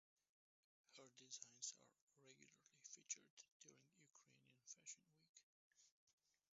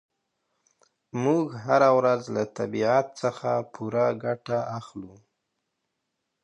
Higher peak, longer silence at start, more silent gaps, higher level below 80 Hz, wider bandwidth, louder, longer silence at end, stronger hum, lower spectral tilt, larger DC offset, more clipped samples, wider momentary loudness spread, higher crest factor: second, -36 dBFS vs -6 dBFS; second, 0.9 s vs 1.15 s; first, 2.02-2.07 s, 3.30-3.37 s, 3.52-3.60 s, 5.29-5.34 s, 5.43-5.71 s, 5.92-6.07 s vs none; second, under -90 dBFS vs -70 dBFS; second, 7.6 kHz vs 10 kHz; second, -58 LUFS vs -25 LUFS; second, 0.45 s vs 1.35 s; neither; second, -1 dB/octave vs -6.5 dB/octave; neither; neither; about the same, 15 LU vs 14 LU; first, 28 dB vs 20 dB